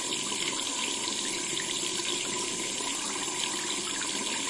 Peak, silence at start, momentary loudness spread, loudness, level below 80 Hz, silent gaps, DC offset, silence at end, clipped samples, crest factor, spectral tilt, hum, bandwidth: -14 dBFS; 0 s; 1 LU; -29 LUFS; -66 dBFS; none; under 0.1%; 0 s; under 0.1%; 18 dB; -0.5 dB/octave; none; 11.5 kHz